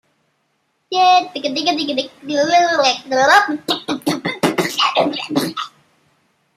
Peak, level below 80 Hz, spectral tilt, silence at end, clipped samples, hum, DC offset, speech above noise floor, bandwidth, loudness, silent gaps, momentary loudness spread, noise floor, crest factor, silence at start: -2 dBFS; -66 dBFS; -3 dB/octave; 0.9 s; under 0.1%; none; under 0.1%; 50 dB; 15.5 kHz; -16 LUFS; none; 10 LU; -66 dBFS; 16 dB; 0.9 s